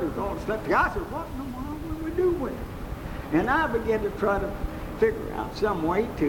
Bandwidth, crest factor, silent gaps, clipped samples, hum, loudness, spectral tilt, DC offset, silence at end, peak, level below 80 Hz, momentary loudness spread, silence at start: 18 kHz; 16 dB; none; under 0.1%; none; -27 LUFS; -7 dB/octave; under 0.1%; 0 s; -10 dBFS; -38 dBFS; 11 LU; 0 s